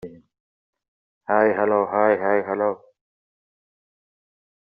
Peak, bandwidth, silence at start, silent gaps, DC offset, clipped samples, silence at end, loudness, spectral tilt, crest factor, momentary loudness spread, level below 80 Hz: -4 dBFS; 4.8 kHz; 0.05 s; 0.40-0.73 s, 0.88-1.21 s; under 0.1%; under 0.1%; 2 s; -21 LUFS; -6 dB/octave; 20 dB; 18 LU; -70 dBFS